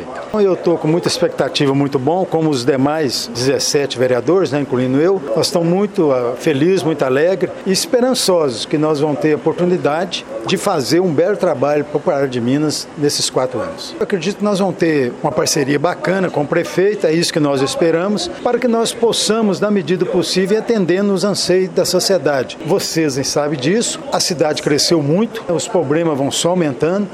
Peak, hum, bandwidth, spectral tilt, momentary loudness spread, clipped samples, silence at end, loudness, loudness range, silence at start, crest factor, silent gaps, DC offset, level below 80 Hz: -2 dBFS; none; 16 kHz; -4.5 dB/octave; 4 LU; under 0.1%; 0 s; -16 LUFS; 2 LU; 0 s; 14 dB; none; under 0.1%; -54 dBFS